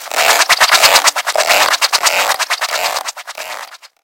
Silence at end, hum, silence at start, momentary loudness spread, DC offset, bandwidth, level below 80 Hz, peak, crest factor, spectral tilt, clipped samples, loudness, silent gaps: 0.15 s; none; 0 s; 18 LU; under 0.1%; over 20 kHz; -56 dBFS; 0 dBFS; 14 dB; 2 dB/octave; 0.3%; -11 LUFS; none